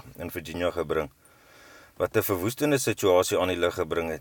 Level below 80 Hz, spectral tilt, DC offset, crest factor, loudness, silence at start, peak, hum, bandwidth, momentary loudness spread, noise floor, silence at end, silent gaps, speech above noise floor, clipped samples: -54 dBFS; -4.5 dB/octave; under 0.1%; 18 dB; -26 LUFS; 0.05 s; -8 dBFS; none; 19 kHz; 12 LU; -54 dBFS; 0 s; none; 28 dB; under 0.1%